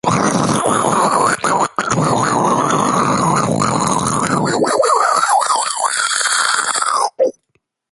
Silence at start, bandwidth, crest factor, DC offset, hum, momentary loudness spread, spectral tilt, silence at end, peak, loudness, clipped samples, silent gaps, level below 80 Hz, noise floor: 0.05 s; 12 kHz; 16 dB; under 0.1%; none; 3 LU; -3.5 dB/octave; 0.6 s; 0 dBFS; -15 LUFS; under 0.1%; none; -48 dBFS; -65 dBFS